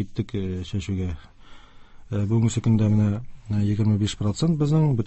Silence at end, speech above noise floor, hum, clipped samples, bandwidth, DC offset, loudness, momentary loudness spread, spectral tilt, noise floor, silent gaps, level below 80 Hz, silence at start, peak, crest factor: 0 s; 22 dB; none; under 0.1%; 8.4 kHz; under 0.1%; -24 LUFS; 9 LU; -7.5 dB/octave; -44 dBFS; none; -42 dBFS; 0 s; -10 dBFS; 14 dB